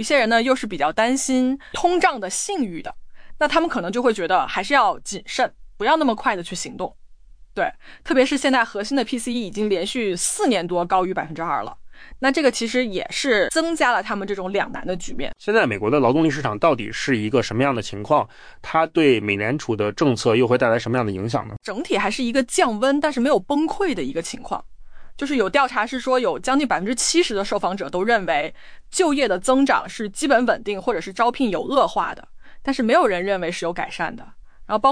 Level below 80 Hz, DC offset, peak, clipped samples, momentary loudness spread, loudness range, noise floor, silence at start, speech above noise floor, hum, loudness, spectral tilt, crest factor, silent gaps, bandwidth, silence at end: -46 dBFS; under 0.1%; -4 dBFS; under 0.1%; 10 LU; 2 LU; -45 dBFS; 0 s; 24 dB; none; -21 LUFS; -4 dB/octave; 16 dB; none; 10.5 kHz; 0 s